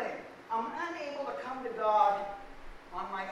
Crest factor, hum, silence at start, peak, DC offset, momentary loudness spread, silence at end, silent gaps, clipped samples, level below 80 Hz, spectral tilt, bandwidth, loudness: 20 dB; none; 0 s; -14 dBFS; under 0.1%; 18 LU; 0 s; none; under 0.1%; -58 dBFS; -4.5 dB/octave; 11.5 kHz; -33 LUFS